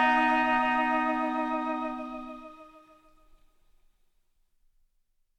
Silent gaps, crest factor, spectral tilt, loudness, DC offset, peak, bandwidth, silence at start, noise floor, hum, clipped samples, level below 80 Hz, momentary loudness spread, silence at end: none; 20 dB; -4 dB/octave; -27 LUFS; under 0.1%; -12 dBFS; 10 kHz; 0 s; -72 dBFS; none; under 0.1%; -58 dBFS; 19 LU; 2.7 s